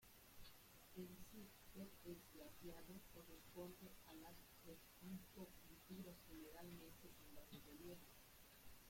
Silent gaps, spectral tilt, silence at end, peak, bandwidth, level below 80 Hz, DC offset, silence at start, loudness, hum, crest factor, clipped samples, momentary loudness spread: none; -4.5 dB/octave; 0 s; -44 dBFS; 16.5 kHz; -72 dBFS; under 0.1%; 0 s; -61 LUFS; none; 16 dB; under 0.1%; 7 LU